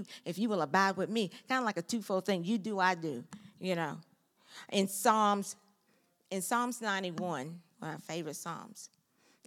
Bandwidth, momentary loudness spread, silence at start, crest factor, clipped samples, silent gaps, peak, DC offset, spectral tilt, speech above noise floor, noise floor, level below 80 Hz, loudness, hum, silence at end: 17 kHz; 17 LU; 0 s; 22 dB; under 0.1%; none; -12 dBFS; under 0.1%; -4 dB/octave; 39 dB; -73 dBFS; -90 dBFS; -34 LUFS; none; 0.6 s